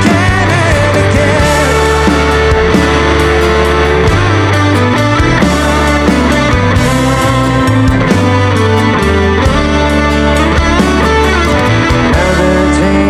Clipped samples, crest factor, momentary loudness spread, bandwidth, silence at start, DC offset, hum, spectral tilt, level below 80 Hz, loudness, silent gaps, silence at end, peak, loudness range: under 0.1%; 8 dB; 1 LU; 13.5 kHz; 0 s; under 0.1%; none; -5.5 dB/octave; -18 dBFS; -9 LUFS; none; 0 s; 0 dBFS; 1 LU